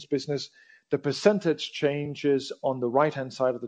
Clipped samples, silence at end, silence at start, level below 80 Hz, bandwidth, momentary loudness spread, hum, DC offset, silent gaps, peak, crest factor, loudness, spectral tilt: under 0.1%; 0 s; 0 s; -70 dBFS; 9.4 kHz; 8 LU; none; under 0.1%; none; -6 dBFS; 20 dB; -27 LUFS; -5.5 dB/octave